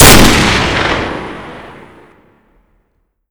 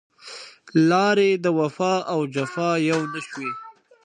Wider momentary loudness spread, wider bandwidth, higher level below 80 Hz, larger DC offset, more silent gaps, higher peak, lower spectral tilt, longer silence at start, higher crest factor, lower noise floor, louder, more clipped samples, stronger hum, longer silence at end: first, 24 LU vs 20 LU; first, over 20 kHz vs 10 kHz; first, -22 dBFS vs -74 dBFS; neither; neither; first, 0 dBFS vs -6 dBFS; second, -3 dB/octave vs -6 dB/octave; second, 0 s vs 0.25 s; about the same, 12 dB vs 16 dB; first, -62 dBFS vs -42 dBFS; first, -9 LUFS vs -22 LUFS; first, 4% vs under 0.1%; neither; first, 1.55 s vs 0.35 s